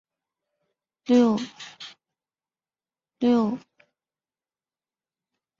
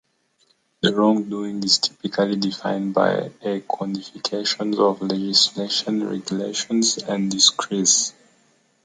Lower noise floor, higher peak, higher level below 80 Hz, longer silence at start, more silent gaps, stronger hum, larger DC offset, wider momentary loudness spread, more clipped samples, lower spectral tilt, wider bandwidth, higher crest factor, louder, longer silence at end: first, under -90 dBFS vs -64 dBFS; second, -8 dBFS vs -2 dBFS; about the same, -72 dBFS vs -68 dBFS; first, 1.1 s vs 0.85 s; neither; neither; neither; first, 21 LU vs 10 LU; neither; first, -6 dB/octave vs -3 dB/octave; second, 7.4 kHz vs 10 kHz; about the same, 20 dB vs 20 dB; second, -23 LUFS vs -20 LUFS; first, 2 s vs 0.75 s